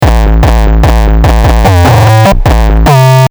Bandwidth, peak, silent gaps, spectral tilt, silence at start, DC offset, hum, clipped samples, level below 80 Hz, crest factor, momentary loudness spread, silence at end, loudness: over 20 kHz; 0 dBFS; none; -6.5 dB/octave; 0 s; under 0.1%; none; 2%; -8 dBFS; 4 dB; 3 LU; 0.05 s; -6 LUFS